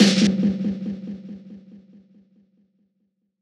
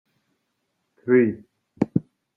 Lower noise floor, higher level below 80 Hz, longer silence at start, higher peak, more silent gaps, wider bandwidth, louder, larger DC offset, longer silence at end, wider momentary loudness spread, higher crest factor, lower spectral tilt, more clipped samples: about the same, -72 dBFS vs -75 dBFS; first, -58 dBFS vs -64 dBFS; second, 0 s vs 1.05 s; about the same, -2 dBFS vs -4 dBFS; neither; first, 11.5 kHz vs 3.1 kHz; about the same, -22 LUFS vs -22 LUFS; neither; first, 1.65 s vs 0.35 s; first, 24 LU vs 16 LU; about the same, 22 dB vs 22 dB; second, -5 dB/octave vs -10.5 dB/octave; neither